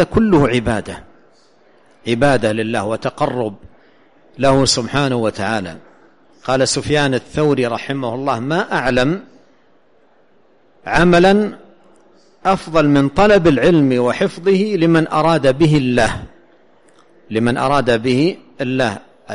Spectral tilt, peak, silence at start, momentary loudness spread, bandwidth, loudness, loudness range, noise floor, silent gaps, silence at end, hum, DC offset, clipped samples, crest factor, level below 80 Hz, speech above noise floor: -5.5 dB/octave; -2 dBFS; 0 s; 11 LU; 11.5 kHz; -16 LUFS; 6 LU; -55 dBFS; none; 0 s; none; 0.5%; under 0.1%; 16 dB; -38 dBFS; 40 dB